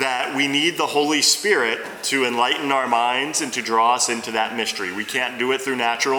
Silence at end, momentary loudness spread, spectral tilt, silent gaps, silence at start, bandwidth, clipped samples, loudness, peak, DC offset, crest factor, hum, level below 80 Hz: 0 s; 7 LU; -1.5 dB/octave; none; 0 s; over 20 kHz; under 0.1%; -20 LUFS; -4 dBFS; under 0.1%; 16 dB; none; -72 dBFS